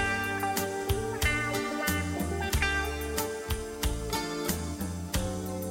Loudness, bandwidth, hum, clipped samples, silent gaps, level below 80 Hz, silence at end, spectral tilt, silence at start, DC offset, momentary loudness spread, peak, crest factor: -31 LUFS; 16.5 kHz; none; under 0.1%; none; -38 dBFS; 0 s; -4 dB/octave; 0 s; under 0.1%; 6 LU; -14 dBFS; 18 dB